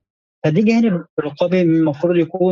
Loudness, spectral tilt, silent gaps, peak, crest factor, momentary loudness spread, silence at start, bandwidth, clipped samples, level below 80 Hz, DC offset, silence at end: -17 LUFS; -8.5 dB/octave; 1.09-1.17 s; -4 dBFS; 14 dB; 7 LU; 0.45 s; 7.4 kHz; under 0.1%; -66 dBFS; under 0.1%; 0 s